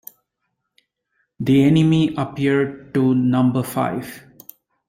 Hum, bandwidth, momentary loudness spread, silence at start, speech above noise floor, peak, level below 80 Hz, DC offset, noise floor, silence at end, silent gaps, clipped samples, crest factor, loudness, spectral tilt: none; 16.5 kHz; 12 LU; 1.4 s; 58 dB; -6 dBFS; -56 dBFS; under 0.1%; -76 dBFS; 0.7 s; none; under 0.1%; 14 dB; -18 LUFS; -7.5 dB/octave